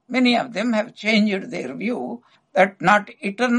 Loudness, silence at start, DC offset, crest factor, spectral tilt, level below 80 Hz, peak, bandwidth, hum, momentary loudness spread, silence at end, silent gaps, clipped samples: -21 LUFS; 0.1 s; under 0.1%; 20 dB; -5 dB/octave; -66 dBFS; 0 dBFS; 10 kHz; none; 12 LU; 0 s; none; under 0.1%